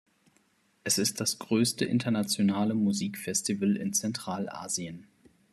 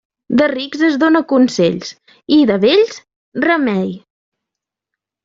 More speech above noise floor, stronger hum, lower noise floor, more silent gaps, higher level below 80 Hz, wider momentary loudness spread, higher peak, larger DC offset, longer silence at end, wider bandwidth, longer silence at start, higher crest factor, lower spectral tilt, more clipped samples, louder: second, 39 dB vs 69 dB; neither; second, -68 dBFS vs -83 dBFS; second, none vs 3.16-3.32 s; second, -70 dBFS vs -58 dBFS; second, 8 LU vs 14 LU; second, -12 dBFS vs -2 dBFS; neither; second, 0.5 s vs 1.25 s; first, 14 kHz vs 7.8 kHz; first, 0.85 s vs 0.3 s; about the same, 18 dB vs 14 dB; second, -4 dB/octave vs -5.5 dB/octave; neither; second, -29 LUFS vs -14 LUFS